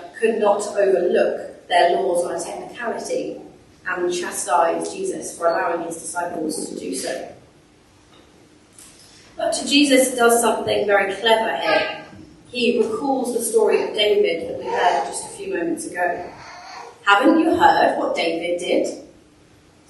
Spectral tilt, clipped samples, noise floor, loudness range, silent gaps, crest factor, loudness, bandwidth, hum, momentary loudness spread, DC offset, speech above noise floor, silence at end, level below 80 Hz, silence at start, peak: -2.5 dB/octave; under 0.1%; -52 dBFS; 8 LU; none; 20 dB; -20 LUFS; 12.5 kHz; none; 13 LU; under 0.1%; 33 dB; 0.85 s; -60 dBFS; 0 s; 0 dBFS